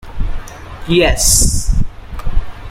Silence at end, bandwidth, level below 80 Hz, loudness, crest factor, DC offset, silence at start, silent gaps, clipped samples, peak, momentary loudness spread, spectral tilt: 0 s; 16.5 kHz; -18 dBFS; -13 LUFS; 14 dB; under 0.1%; 0.05 s; none; under 0.1%; 0 dBFS; 20 LU; -3 dB/octave